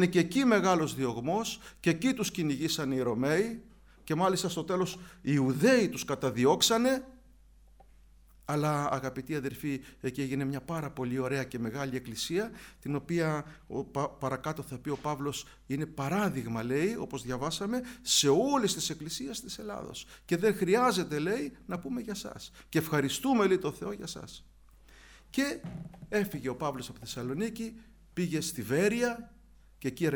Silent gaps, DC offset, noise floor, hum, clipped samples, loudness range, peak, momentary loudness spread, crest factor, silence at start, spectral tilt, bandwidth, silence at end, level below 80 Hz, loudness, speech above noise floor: none; under 0.1%; -58 dBFS; none; under 0.1%; 6 LU; -12 dBFS; 14 LU; 20 dB; 0 s; -4.5 dB/octave; over 20 kHz; 0 s; -58 dBFS; -31 LUFS; 27 dB